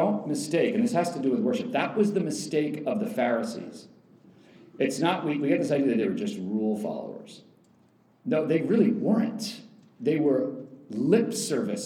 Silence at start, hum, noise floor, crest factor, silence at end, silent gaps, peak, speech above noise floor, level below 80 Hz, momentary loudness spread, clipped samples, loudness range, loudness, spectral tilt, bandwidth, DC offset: 0 s; none; -62 dBFS; 18 dB; 0 s; none; -10 dBFS; 36 dB; -82 dBFS; 12 LU; under 0.1%; 3 LU; -27 LUFS; -5.5 dB/octave; 15.5 kHz; under 0.1%